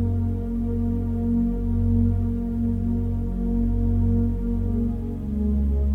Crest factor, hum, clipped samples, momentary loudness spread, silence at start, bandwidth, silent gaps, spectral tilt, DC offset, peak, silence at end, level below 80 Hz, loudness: 12 dB; none; under 0.1%; 5 LU; 0 s; 2.4 kHz; none; -11.5 dB/octave; under 0.1%; -10 dBFS; 0 s; -28 dBFS; -25 LUFS